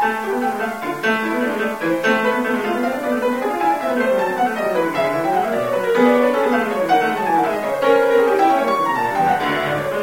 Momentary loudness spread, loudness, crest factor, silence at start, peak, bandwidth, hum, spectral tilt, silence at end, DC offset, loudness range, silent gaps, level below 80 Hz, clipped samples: 6 LU; -18 LUFS; 14 dB; 0 s; -2 dBFS; 16.5 kHz; none; -5 dB/octave; 0 s; 0.3%; 3 LU; none; -58 dBFS; under 0.1%